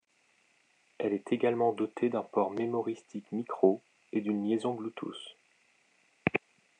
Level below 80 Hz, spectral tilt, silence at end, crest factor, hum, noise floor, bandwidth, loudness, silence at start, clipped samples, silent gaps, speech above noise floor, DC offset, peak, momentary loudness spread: -74 dBFS; -7 dB/octave; 0.45 s; 24 dB; none; -70 dBFS; 9.6 kHz; -32 LUFS; 1 s; under 0.1%; none; 39 dB; under 0.1%; -10 dBFS; 11 LU